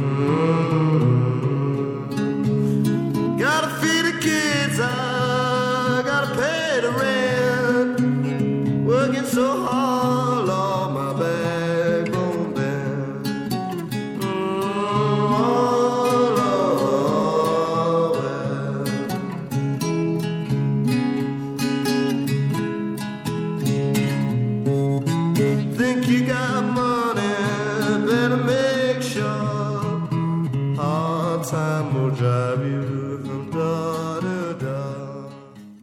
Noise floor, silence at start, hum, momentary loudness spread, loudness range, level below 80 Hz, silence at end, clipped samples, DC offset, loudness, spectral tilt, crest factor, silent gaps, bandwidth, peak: -41 dBFS; 0 s; none; 7 LU; 3 LU; -56 dBFS; 0.05 s; under 0.1%; under 0.1%; -21 LUFS; -6 dB/octave; 14 dB; none; 16.5 kHz; -6 dBFS